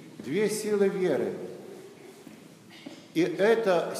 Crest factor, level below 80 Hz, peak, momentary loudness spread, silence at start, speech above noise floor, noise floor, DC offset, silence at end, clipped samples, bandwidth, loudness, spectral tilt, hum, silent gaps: 18 dB; -86 dBFS; -12 dBFS; 24 LU; 0 s; 24 dB; -50 dBFS; under 0.1%; 0 s; under 0.1%; 15.5 kHz; -27 LUFS; -5 dB/octave; none; none